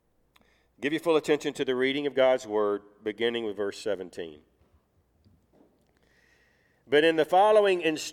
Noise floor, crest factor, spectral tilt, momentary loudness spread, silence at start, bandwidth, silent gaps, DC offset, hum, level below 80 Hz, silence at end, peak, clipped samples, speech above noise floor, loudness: -67 dBFS; 18 dB; -4 dB/octave; 13 LU; 0.8 s; 15.5 kHz; none; under 0.1%; none; -70 dBFS; 0 s; -10 dBFS; under 0.1%; 41 dB; -26 LUFS